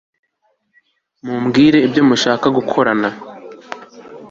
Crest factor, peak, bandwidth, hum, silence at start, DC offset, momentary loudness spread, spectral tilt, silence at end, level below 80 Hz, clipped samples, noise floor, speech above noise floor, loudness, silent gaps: 16 dB; -2 dBFS; 7.8 kHz; none; 1.25 s; under 0.1%; 22 LU; -5.5 dB/octave; 0.05 s; -54 dBFS; under 0.1%; -65 dBFS; 51 dB; -14 LUFS; none